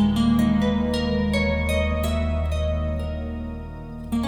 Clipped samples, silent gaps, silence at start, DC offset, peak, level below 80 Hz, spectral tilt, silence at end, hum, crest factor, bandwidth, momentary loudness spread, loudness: under 0.1%; none; 0 s; under 0.1%; -10 dBFS; -30 dBFS; -7 dB/octave; 0 s; none; 14 dB; 18 kHz; 13 LU; -23 LUFS